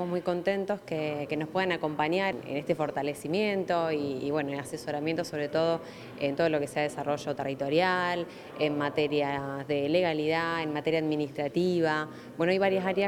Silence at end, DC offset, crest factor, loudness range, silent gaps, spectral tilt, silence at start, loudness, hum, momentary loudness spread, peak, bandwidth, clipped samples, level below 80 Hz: 0 s; under 0.1%; 18 dB; 2 LU; none; -6 dB/octave; 0 s; -29 LUFS; none; 6 LU; -12 dBFS; 19 kHz; under 0.1%; -68 dBFS